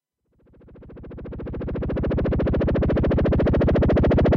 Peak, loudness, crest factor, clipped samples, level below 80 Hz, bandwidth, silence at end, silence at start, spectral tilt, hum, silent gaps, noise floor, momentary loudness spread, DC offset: -14 dBFS; -22 LUFS; 8 dB; under 0.1%; -28 dBFS; 5.8 kHz; 0 s; 0.75 s; -10 dB/octave; none; none; -62 dBFS; 18 LU; under 0.1%